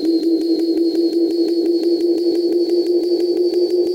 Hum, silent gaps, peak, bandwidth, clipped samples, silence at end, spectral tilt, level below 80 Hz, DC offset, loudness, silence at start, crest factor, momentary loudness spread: none; none; -8 dBFS; 10.5 kHz; under 0.1%; 0 s; -5 dB/octave; -66 dBFS; under 0.1%; -17 LUFS; 0 s; 8 dB; 1 LU